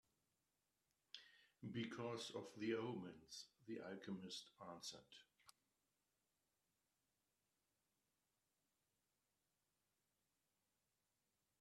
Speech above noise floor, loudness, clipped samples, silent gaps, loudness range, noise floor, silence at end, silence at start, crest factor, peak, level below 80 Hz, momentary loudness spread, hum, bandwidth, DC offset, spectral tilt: over 38 dB; -52 LUFS; under 0.1%; none; 10 LU; under -90 dBFS; 6.1 s; 1.15 s; 24 dB; -34 dBFS; under -90 dBFS; 15 LU; none; 13 kHz; under 0.1%; -4.5 dB/octave